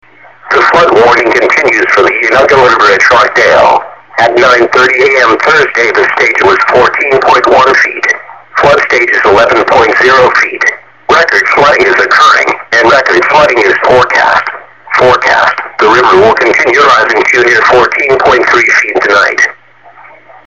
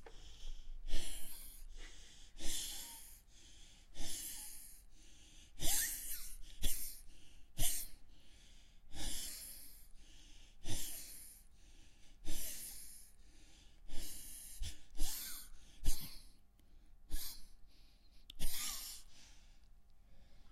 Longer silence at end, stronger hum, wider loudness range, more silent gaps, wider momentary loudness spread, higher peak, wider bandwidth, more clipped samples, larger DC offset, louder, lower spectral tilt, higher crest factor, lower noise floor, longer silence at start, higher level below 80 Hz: first, 0.95 s vs 0.05 s; neither; second, 1 LU vs 8 LU; neither; second, 5 LU vs 23 LU; first, 0 dBFS vs -18 dBFS; second, 9.6 kHz vs 16 kHz; first, 0.6% vs under 0.1%; first, 0.6% vs under 0.1%; first, -5 LUFS vs -45 LUFS; first, -3.5 dB/octave vs -1.5 dB/octave; second, 6 dB vs 20 dB; second, -36 dBFS vs -61 dBFS; first, 0.45 s vs 0 s; first, -40 dBFS vs -46 dBFS